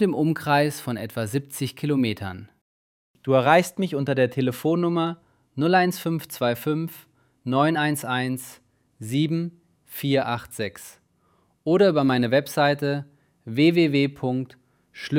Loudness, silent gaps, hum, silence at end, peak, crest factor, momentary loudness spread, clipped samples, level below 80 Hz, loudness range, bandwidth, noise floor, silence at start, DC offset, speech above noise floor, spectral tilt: -23 LUFS; 2.61-3.14 s; none; 0 s; -2 dBFS; 22 dB; 16 LU; under 0.1%; -66 dBFS; 5 LU; 17.5 kHz; -65 dBFS; 0 s; under 0.1%; 42 dB; -6 dB/octave